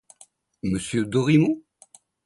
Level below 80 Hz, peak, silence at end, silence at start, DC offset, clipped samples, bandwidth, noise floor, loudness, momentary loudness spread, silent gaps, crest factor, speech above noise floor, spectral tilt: -54 dBFS; -6 dBFS; 0.65 s; 0.65 s; under 0.1%; under 0.1%; 11.5 kHz; -56 dBFS; -23 LUFS; 12 LU; none; 18 dB; 34 dB; -6.5 dB/octave